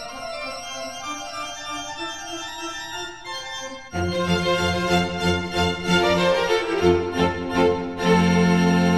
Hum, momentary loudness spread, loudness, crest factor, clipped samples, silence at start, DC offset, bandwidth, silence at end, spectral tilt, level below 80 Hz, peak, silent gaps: none; 13 LU; -23 LUFS; 16 dB; under 0.1%; 0 s; 0.4%; 13.5 kHz; 0 s; -5 dB/octave; -48 dBFS; -6 dBFS; none